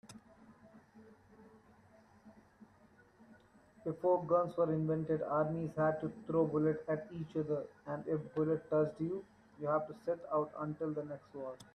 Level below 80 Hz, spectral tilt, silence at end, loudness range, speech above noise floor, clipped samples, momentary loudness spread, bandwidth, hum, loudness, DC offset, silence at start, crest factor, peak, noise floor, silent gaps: -72 dBFS; -9.5 dB/octave; 0.15 s; 4 LU; 29 dB; under 0.1%; 11 LU; 11.5 kHz; none; -37 LUFS; under 0.1%; 0.05 s; 18 dB; -20 dBFS; -65 dBFS; none